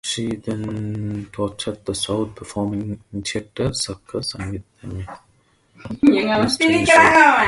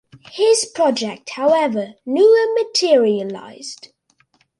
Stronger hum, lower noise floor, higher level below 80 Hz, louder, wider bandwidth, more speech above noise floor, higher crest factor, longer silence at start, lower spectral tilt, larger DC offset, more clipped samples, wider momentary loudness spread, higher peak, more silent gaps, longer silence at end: neither; about the same, -59 dBFS vs -60 dBFS; first, -46 dBFS vs -70 dBFS; about the same, -19 LUFS vs -17 LUFS; about the same, 11.5 kHz vs 11.5 kHz; about the same, 40 dB vs 43 dB; first, 20 dB vs 14 dB; second, 0.05 s vs 0.35 s; first, -4.5 dB/octave vs -3 dB/octave; neither; neither; about the same, 20 LU vs 19 LU; about the same, 0 dBFS vs -2 dBFS; neither; second, 0 s vs 0.85 s